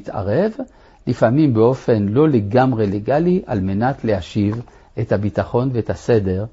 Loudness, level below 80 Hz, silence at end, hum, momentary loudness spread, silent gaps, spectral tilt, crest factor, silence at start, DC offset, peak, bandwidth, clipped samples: -18 LUFS; -44 dBFS; 0.05 s; none; 10 LU; none; -9 dB/octave; 16 dB; 0.05 s; under 0.1%; -2 dBFS; 7.8 kHz; under 0.1%